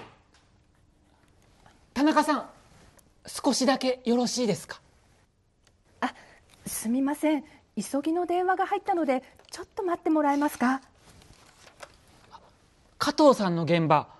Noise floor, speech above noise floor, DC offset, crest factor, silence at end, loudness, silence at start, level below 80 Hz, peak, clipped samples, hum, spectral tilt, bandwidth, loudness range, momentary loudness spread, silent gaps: -65 dBFS; 40 dB; under 0.1%; 20 dB; 0.15 s; -26 LUFS; 0 s; -64 dBFS; -8 dBFS; under 0.1%; none; -5 dB/octave; 12.5 kHz; 4 LU; 16 LU; none